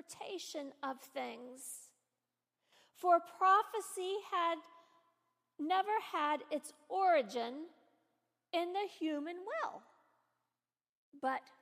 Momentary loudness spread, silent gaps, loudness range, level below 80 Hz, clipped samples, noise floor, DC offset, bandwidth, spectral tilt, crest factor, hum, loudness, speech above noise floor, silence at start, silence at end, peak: 15 LU; 10.89-11.12 s; 7 LU; under -90 dBFS; under 0.1%; under -90 dBFS; under 0.1%; 15 kHz; -2 dB/octave; 22 dB; none; -37 LUFS; over 53 dB; 0.1 s; 0.2 s; -18 dBFS